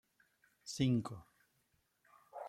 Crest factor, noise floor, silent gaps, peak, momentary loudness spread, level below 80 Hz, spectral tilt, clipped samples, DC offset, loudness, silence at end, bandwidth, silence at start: 20 dB; -79 dBFS; none; -22 dBFS; 20 LU; -72 dBFS; -6 dB/octave; under 0.1%; under 0.1%; -38 LUFS; 0 s; 14 kHz; 0.65 s